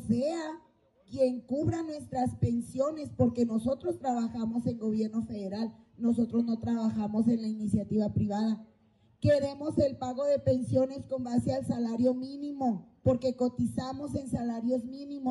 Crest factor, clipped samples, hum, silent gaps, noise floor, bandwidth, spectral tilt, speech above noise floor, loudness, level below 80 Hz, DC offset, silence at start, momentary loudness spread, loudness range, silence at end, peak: 18 dB; under 0.1%; none; none; -65 dBFS; 11.5 kHz; -8 dB/octave; 35 dB; -31 LUFS; -56 dBFS; under 0.1%; 0 s; 8 LU; 2 LU; 0 s; -12 dBFS